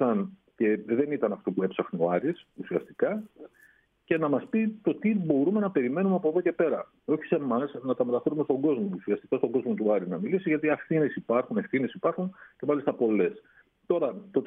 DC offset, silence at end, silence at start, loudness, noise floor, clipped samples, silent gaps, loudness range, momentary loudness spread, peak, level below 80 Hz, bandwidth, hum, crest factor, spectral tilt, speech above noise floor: under 0.1%; 0 s; 0 s; -28 LUFS; -62 dBFS; under 0.1%; none; 3 LU; 6 LU; -10 dBFS; -74 dBFS; 3.8 kHz; none; 18 dB; -10.5 dB/octave; 34 dB